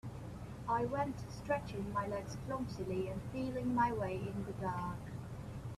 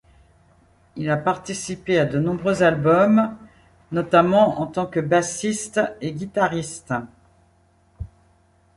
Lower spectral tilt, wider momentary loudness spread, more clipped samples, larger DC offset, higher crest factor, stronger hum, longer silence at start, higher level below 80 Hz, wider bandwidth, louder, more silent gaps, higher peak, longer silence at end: first, -7 dB/octave vs -5.5 dB/octave; about the same, 12 LU vs 13 LU; neither; neither; about the same, 18 dB vs 20 dB; neither; second, 0.05 s vs 0.95 s; about the same, -56 dBFS vs -52 dBFS; first, 14 kHz vs 11.5 kHz; second, -40 LUFS vs -21 LUFS; neither; second, -22 dBFS vs -2 dBFS; second, 0 s vs 0.7 s